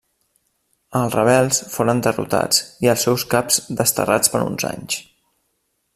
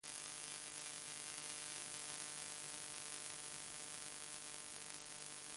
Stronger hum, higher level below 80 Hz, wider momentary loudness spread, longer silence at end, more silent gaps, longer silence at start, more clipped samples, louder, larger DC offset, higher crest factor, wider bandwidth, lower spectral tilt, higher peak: neither; first, -54 dBFS vs -82 dBFS; first, 9 LU vs 3 LU; first, 0.95 s vs 0 s; neither; first, 0.9 s vs 0.05 s; neither; first, -18 LUFS vs -48 LUFS; neither; about the same, 20 dB vs 24 dB; first, 16 kHz vs 11.5 kHz; first, -3.5 dB/octave vs 0 dB/octave; first, 0 dBFS vs -26 dBFS